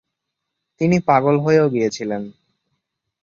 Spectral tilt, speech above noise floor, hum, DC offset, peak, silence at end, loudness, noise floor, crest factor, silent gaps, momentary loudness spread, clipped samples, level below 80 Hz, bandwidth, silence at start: -7 dB/octave; 62 dB; none; under 0.1%; -2 dBFS; 0.95 s; -18 LUFS; -79 dBFS; 18 dB; none; 12 LU; under 0.1%; -58 dBFS; 7.6 kHz; 0.8 s